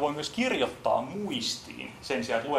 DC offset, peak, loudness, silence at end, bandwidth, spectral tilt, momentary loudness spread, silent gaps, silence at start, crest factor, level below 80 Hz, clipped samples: under 0.1%; -12 dBFS; -30 LUFS; 0 s; 16 kHz; -3.5 dB/octave; 8 LU; none; 0 s; 18 dB; -62 dBFS; under 0.1%